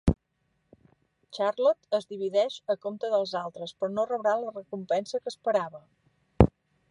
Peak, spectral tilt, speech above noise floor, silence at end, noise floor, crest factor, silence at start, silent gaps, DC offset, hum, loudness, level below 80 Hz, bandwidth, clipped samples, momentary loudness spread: 0 dBFS; -7 dB/octave; 46 dB; 0.4 s; -75 dBFS; 28 dB; 0.05 s; none; under 0.1%; none; -29 LUFS; -42 dBFS; 11 kHz; under 0.1%; 12 LU